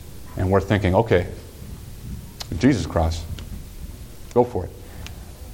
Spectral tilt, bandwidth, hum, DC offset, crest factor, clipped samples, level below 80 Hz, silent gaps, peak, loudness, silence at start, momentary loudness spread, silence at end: -7 dB/octave; 17 kHz; none; under 0.1%; 20 dB; under 0.1%; -36 dBFS; none; -2 dBFS; -22 LUFS; 0 s; 20 LU; 0 s